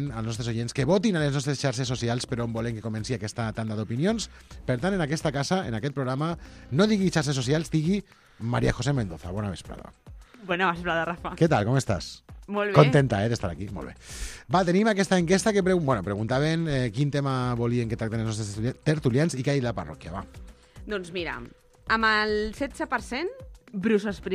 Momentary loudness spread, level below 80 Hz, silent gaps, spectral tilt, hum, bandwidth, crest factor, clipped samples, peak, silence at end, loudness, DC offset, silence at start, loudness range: 15 LU; -46 dBFS; none; -6 dB/octave; none; 13.5 kHz; 24 dB; under 0.1%; -2 dBFS; 0 s; -26 LUFS; under 0.1%; 0 s; 5 LU